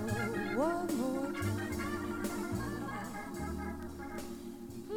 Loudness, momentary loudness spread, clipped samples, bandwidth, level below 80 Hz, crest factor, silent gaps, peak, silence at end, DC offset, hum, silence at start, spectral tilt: -38 LUFS; 10 LU; under 0.1%; 18 kHz; -54 dBFS; 16 dB; none; -20 dBFS; 0 s; under 0.1%; none; 0 s; -6 dB/octave